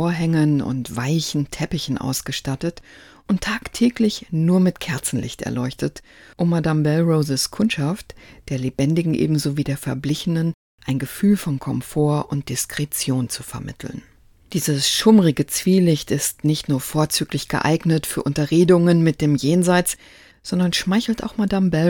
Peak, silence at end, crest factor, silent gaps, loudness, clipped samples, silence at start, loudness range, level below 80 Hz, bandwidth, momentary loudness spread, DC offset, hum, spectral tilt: 0 dBFS; 0 s; 20 dB; 10.54-10.78 s; -20 LUFS; under 0.1%; 0 s; 5 LU; -48 dBFS; 18 kHz; 10 LU; under 0.1%; none; -5.5 dB/octave